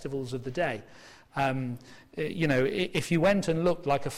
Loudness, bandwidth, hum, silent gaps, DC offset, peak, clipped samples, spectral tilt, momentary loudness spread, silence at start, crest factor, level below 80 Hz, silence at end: -29 LUFS; 16 kHz; none; none; under 0.1%; -16 dBFS; under 0.1%; -6 dB/octave; 13 LU; 0 s; 14 dB; -52 dBFS; 0 s